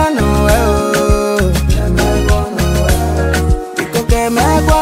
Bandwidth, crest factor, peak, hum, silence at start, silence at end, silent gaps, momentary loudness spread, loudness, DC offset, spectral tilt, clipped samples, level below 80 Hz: 16.5 kHz; 12 dB; 0 dBFS; none; 0 s; 0 s; none; 4 LU; -13 LUFS; under 0.1%; -5.5 dB/octave; under 0.1%; -16 dBFS